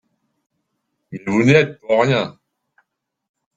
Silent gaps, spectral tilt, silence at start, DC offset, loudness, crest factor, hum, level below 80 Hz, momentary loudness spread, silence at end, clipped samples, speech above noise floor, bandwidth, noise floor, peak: none; -6.5 dB/octave; 1.1 s; under 0.1%; -16 LUFS; 20 dB; none; -56 dBFS; 16 LU; 1.25 s; under 0.1%; 57 dB; 9 kHz; -73 dBFS; -2 dBFS